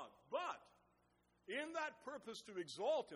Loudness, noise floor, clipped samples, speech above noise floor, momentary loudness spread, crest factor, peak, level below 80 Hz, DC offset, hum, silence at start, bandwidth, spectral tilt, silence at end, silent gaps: -47 LUFS; -79 dBFS; under 0.1%; 33 dB; 11 LU; 18 dB; -30 dBFS; -88 dBFS; under 0.1%; 60 Hz at -80 dBFS; 0 s; 11.5 kHz; -3 dB/octave; 0 s; none